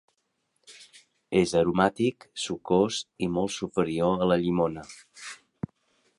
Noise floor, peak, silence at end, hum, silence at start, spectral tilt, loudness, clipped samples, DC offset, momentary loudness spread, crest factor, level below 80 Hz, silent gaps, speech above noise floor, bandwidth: -76 dBFS; -6 dBFS; 0.85 s; none; 0.7 s; -5.5 dB/octave; -26 LUFS; under 0.1%; under 0.1%; 18 LU; 22 dB; -56 dBFS; none; 50 dB; 11.5 kHz